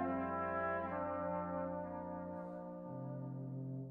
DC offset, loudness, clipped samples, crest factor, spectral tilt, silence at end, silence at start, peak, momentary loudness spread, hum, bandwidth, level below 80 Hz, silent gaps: under 0.1%; -42 LUFS; under 0.1%; 14 dB; -10.5 dB/octave; 0 s; 0 s; -28 dBFS; 8 LU; 50 Hz at -80 dBFS; 3.9 kHz; -70 dBFS; none